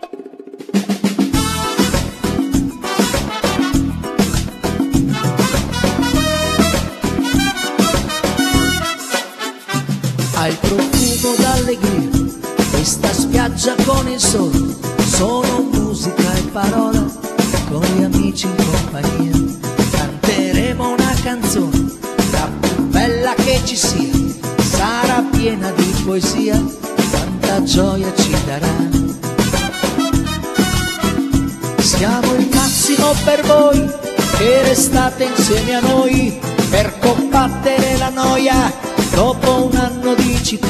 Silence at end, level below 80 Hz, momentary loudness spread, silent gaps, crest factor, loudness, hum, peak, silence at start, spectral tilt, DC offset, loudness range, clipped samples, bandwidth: 0 s; -28 dBFS; 6 LU; none; 16 dB; -15 LUFS; none; 0 dBFS; 0.05 s; -4.5 dB/octave; under 0.1%; 4 LU; under 0.1%; 14 kHz